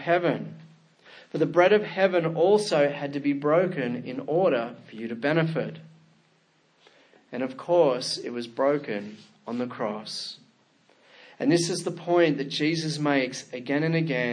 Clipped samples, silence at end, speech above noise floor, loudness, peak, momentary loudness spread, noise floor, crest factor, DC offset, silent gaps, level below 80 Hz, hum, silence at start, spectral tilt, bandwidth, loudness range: under 0.1%; 0 s; 40 dB; -26 LUFS; -6 dBFS; 14 LU; -65 dBFS; 20 dB; under 0.1%; none; -78 dBFS; none; 0 s; -5.5 dB/octave; 10.5 kHz; 7 LU